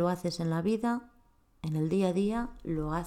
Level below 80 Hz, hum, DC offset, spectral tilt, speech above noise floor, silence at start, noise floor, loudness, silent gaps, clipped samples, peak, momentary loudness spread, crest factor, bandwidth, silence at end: -50 dBFS; none; under 0.1%; -7 dB/octave; 34 dB; 0 s; -64 dBFS; -32 LUFS; none; under 0.1%; -16 dBFS; 7 LU; 16 dB; 14.5 kHz; 0 s